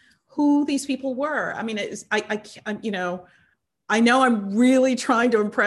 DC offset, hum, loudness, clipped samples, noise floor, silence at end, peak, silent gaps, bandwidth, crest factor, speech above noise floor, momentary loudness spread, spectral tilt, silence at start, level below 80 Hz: under 0.1%; none; -22 LUFS; under 0.1%; -49 dBFS; 0 s; -6 dBFS; none; 12 kHz; 16 dB; 28 dB; 12 LU; -4.5 dB/octave; 0.35 s; -68 dBFS